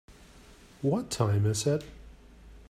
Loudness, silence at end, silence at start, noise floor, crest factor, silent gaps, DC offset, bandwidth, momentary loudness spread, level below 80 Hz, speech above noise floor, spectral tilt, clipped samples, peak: -29 LUFS; 0.05 s; 0.1 s; -54 dBFS; 20 dB; none; under 0.1%; 14.5 kHz; 7 LU; -54 dBFS; 26 dB; -6 dB/octave; under 0.1%; -12 dBFS